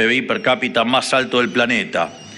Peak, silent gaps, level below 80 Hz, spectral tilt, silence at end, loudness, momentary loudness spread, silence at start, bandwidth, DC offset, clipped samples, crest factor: -2 dBFS; none; -58 dBFS; -3.5 dB/octave; 0 s; -17 LUFS; 3 LU; 0 s; 12 kHz; under 0.1%; under 0.1%; 16 dB